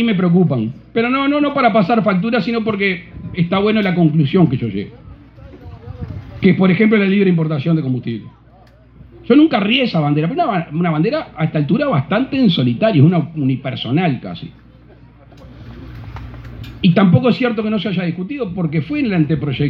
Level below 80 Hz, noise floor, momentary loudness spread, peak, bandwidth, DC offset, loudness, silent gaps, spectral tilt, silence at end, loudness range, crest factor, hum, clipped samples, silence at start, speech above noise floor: -44 dBFS; -45 dBFS; 19 LU; 0 dBFS; 5.4 kHz; under 0.1%; -15 LUFS; none; -9.5 dB/octave; 0 s; 3 LU; 16 dB; none; under 0.1%; 0 s; 30 dB